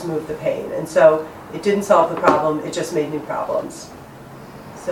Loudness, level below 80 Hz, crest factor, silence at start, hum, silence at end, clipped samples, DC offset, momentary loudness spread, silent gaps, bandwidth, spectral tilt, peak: -19 LUFS; -54 dBFS; 20 dB; 0 s; none; 0 s; under 0.1%; under 0.1%; 23 LU; none; 16.5 kHz; -5.5 dB/octave; 0 dBFS